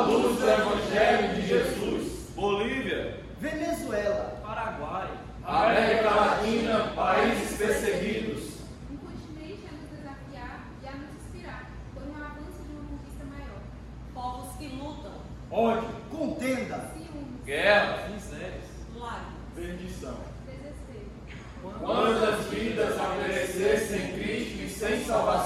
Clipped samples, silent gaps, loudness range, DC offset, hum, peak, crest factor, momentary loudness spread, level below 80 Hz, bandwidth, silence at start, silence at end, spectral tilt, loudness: under 0.1%; none; 15 LU; under 0.1%; none; -8 dBFS; 22 dB; 19 LU; -46 dBFS; 16 kHz; 0 s; 0 s; -5 dB/octave; -28 LUFS